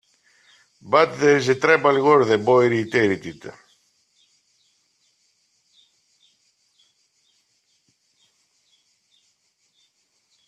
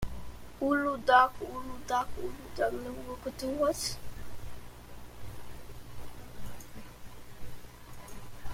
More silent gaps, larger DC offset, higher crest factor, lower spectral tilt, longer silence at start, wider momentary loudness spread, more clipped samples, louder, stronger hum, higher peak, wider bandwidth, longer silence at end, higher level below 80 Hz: neither; neither; about the same, 24 dB vs 24 dB; first, -5.5 dB/octave vs -4 dB/octave; first, 0.85 s vs 0 s; second, 14 LU vs 21 LU; neither; first, -18 LUFS vs -31 LUFS; neither; first, 0 dBFS vs -10 dBFS; second, 10.5 kHz vs 16.5 kHz; first, 7 s vs 0 s; second, -66 dBFS vs -50 dBFS